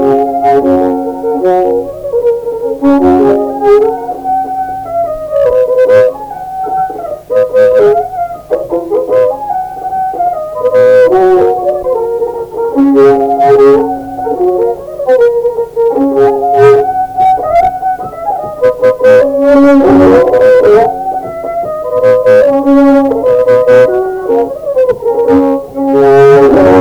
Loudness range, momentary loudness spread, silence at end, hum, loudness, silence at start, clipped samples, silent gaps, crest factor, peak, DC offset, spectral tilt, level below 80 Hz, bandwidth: 4 LU; 11 LU; 0 s; none; -9 LUFS; 0 s; 0.4%; none; 8 dB; 0 dBFS; under 0.1%; -7.5 dB/octave; -40 dBFS; 19.5 kHz